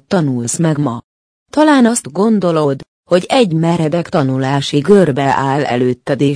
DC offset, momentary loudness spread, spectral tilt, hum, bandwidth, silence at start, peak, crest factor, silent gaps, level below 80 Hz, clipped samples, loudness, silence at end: under 0.1%; 7 LU; -6 dB/octave; none; 10.5 kHz; 0.1 s; 0 dBFS; 14 dB; 1.04-1.46 s, 2.88-3.03 s; -52 dBFS; under 0.1%; -13 LUFS; 0 s